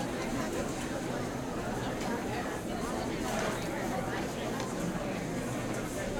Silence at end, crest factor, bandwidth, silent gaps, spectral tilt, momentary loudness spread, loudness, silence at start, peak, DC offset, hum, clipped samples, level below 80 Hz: 0 s; 14 dB; 17.5 kHz; none; -5 dB/octave; 2 LU; -35 LUFS; 0 s; -20 dBFS; under 0.1%; none; under 0.1%; -50 dBFS